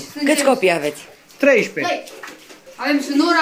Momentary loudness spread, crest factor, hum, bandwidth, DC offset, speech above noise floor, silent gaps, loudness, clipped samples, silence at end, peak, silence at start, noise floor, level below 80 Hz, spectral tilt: 20 LU; 16 dB; none; 16 kHz; under 0.1%; 24 dB; none; -18 LUFS; under 0.1%; 0 s; -4 dBFS; 0 s; -41 dBFS; -68 dBFS; -3.5 dB/octave